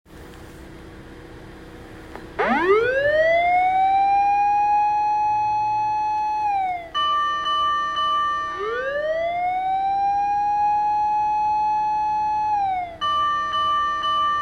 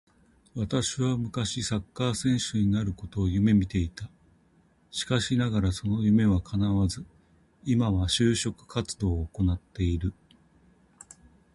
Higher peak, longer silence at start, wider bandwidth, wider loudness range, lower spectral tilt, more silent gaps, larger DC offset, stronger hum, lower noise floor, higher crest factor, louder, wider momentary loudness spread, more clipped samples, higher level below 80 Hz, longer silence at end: about the same, -8 dBFS vs -10 dBFS; second, 0.1 s vs 0.55 s; about the same, 10.5 kHz vs 11.5 kHz; about the same, 3 LU vs 2 LU; second, -4 dB/octave vs -5.5 dB/octave; neither; neither; neither; second, -41 dBFS vs -63 dBFS; about the same, 14 dB vs 18 dB; first, -21 LUFS vs -27 LUFS; first, 23 LU vs 11 LU; neither; second, -50 dBFS vs -40 dBFS; second, 0 s vs 1.45 s